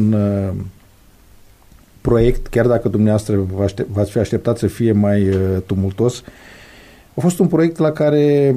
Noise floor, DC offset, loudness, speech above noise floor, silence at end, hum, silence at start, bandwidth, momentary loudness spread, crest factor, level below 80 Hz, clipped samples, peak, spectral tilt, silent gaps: -47 dBFS; under 0.1%; -17 LUFS; 32 dB; 0 s; none; 0 s; 15 kHz; 6 LU; 16 dB; -34 dBFS; under 0.1%; -2 dBFS; -8 dB/octave; none